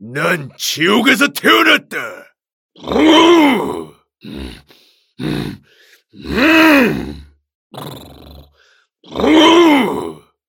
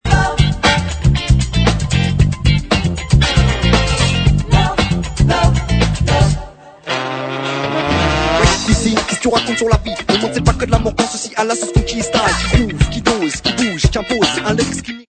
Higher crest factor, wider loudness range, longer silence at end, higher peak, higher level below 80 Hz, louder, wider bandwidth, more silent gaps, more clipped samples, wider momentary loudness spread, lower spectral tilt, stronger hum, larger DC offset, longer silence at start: about the same, 14 dB vs 14 dB; about the same, 4 LU vs 2 LU; first, 0.35 s vs 0.05 s; about the same, 0 dBFS vs 0 dBFS; second, -42 dBFS vs -22 dBFS; first, -12 LUFS vs -15 LUFS; first, 18 kHz vs 9.2 kHz; first, 2.52-2.69 s, 7.55-7.70 s vs none; neither; first, 23 LU vs 5 LU; about the same, -4 dB/octave vs -5 dB/octave; neither; neither; about the same, 0 s vs 0.05 s